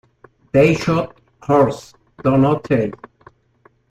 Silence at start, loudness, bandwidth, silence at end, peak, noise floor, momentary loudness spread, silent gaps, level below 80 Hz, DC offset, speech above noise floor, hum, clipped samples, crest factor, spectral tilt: 0.55 s; -17 LUFS; 13 kHz; 0.95 s; -2 dBFS; -56 dBFS; 14 LU; none; -48 dBFS; under 0.1%; 40 dB; none; under 0.1%; 18 dB; -7.5 dB/octave